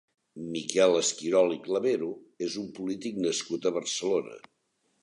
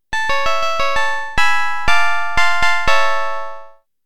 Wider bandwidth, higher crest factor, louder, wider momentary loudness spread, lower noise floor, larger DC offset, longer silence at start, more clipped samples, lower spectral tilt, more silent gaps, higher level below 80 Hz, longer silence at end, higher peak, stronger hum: second, 11 kHz vs 17.5 kHz; first, 20 dB vs 14 dB; second, -28 LUFS vs -17 LUFS; first, 12 LU vs 6 LU; first, -74 dBFS vs -38 dBFS; second, under 0.1% vs 10%; first, 0.35 s vs 0 s; neither; first, -3.5 dB/octave vs -1.5 dB/octave; neither; second, -74 dBFS vs -36 dBFS; first, 0.65 s vs 0 s; second, -8 dBFS vs 0 dBFS; neither